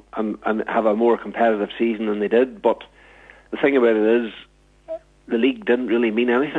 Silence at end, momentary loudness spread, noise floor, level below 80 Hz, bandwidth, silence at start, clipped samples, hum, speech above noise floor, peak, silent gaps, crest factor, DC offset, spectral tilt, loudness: 0 s; 14 LU; -48 dBFS; -58 dBFS; 4.4 kHz; 0.15 s; under 0.1%; none; 28 dB; -4 dBFS; none; 16 dB; under 0.1%; -7.5 dB/octave; -20 LUFS